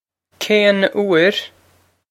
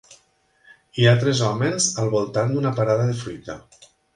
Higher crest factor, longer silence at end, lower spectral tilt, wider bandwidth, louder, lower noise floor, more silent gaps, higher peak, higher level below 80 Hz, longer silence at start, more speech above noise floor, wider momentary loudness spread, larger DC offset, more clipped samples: about the same, 16 dB vs 20 dB; about the same, 0.65 s vs 0.55 s; about the same, -4.5 dB/octave vs -5 dB/octave; first, 16.5 kHz vs 11.5 kHz; first, -15 LUFS vs -20 LUFS; second, -57 dBFS vs -61 dBFS; neither; about the same, 0 dBFS vs -2 dBFS; second, -70 dBFS vs -56 dBFS; second, 0.4 s vs 0.95 s; about the same, 42 dB vs 41 dB; second, 13 LU vs 17 LU; neither; neither